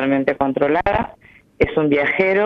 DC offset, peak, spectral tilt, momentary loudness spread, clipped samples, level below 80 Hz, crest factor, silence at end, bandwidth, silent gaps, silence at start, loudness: under 0.1%; -2 dBFS; -8 dB/octave; 6 LU; under 0.1%; -40 dBFS; 16 dB; 0 s; 6 kHz; none; 0 s; -18 LUFS